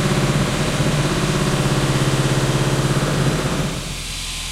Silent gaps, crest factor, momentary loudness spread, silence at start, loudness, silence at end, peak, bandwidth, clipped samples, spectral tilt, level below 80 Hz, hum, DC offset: none; 14 dB; 7 LU; 0 s; -19 LUFS; 0 s; -4 dBFS; 15.5 kHz; under 0.1%; -5 dB/octave; -32 dBFS; none; under 0.1%